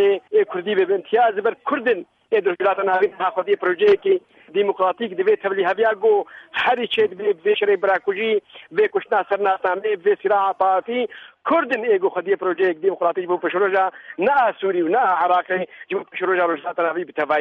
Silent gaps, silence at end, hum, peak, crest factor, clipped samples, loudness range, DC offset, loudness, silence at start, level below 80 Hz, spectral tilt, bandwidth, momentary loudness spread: none; 0 s; none; -6 dBFS; 14 dB; under 0.1%; 1 LU; under 0.1%; -20 LUFS; 0 s; -70 dBFS; -6.5 dB/octave; 4.8 kHz; 6 LU